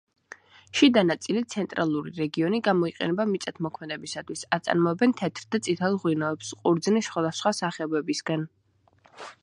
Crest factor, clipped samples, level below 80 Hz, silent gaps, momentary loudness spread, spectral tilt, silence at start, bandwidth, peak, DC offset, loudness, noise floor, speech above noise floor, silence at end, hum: 20 dB; under 0.1%; -70 dBFS; none; 11 LU; -5 dB/octave; 0.75 s; 11.5 kHz; -6 dBFS; under 0.1%; -26 LUFS; -62 dBFS; 36 dB; 0.1 s; none